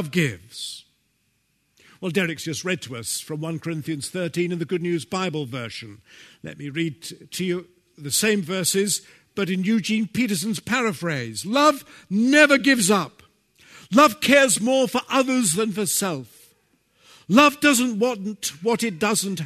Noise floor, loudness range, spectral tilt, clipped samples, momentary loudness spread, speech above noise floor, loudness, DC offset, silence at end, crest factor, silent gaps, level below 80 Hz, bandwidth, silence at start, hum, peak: -69 dBFS; 10 LU; -3.5 dB/octave; under 0.1%; 17 LU; 47 dB; -21 LUFS; under 0.1%; 0 s; 20 dB; none; -64 dBFS; 13.5 kHz; 0 s; none; -2 dBFS